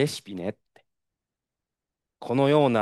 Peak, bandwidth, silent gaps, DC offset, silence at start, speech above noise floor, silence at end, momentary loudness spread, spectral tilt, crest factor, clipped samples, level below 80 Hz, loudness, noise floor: -6 dBFS; 12.5 kHz; none; under 0.1%; 0 s; 64 dB; 0 s; 15 LU; -6.5 dB/octave; 20 dB; under 0.1%; -72 dBFS; -25 LUFS; -88 dBFS